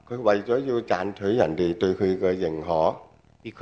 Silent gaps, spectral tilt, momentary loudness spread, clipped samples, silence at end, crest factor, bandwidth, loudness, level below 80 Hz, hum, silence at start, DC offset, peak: none; -7 dB/octave; 5 LU; under 0.1%; 0 s; 18 dB; 7.4 kHz; -24 LUFS; -56 dBFS; none; 0.1 s; under 0.1%; -6 dBFS